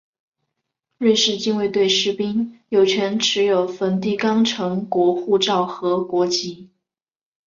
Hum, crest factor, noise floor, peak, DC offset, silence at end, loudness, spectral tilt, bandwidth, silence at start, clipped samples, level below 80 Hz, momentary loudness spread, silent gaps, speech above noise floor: none; 16 dB; -79 dBFS; -4 dBFS; under 0.1%; 0.8 s; -19 LUFS; -4 dB/octave; 7.6 kHz; 1 s; under 0.1%; -64 dBFS; 6 LU; none; 60 dB